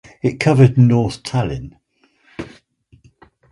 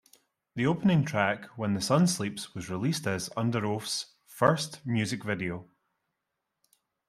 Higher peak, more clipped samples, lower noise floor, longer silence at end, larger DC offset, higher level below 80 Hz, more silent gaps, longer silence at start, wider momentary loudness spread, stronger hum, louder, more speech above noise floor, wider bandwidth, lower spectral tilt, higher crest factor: first, 0 dBFS vs -6 dBFS; neither; second, -58 dBFS vs -84 dBFS; second, 1.05 s vs 1.45 s; neither; first, -44 dBFS vs -66 dBFS; neither; second, 0.25 s vs 0.55 s; first, 24 LU vs 11 LU; neither; first, -15 LUFS vs -29 LUFS; second, 43 dB vs 55 dB; second, 11 kHz vs 15.5 kHz; first, -7.5 dB/octave vs -5 dB/octave; second, 18 dB vs 24 dB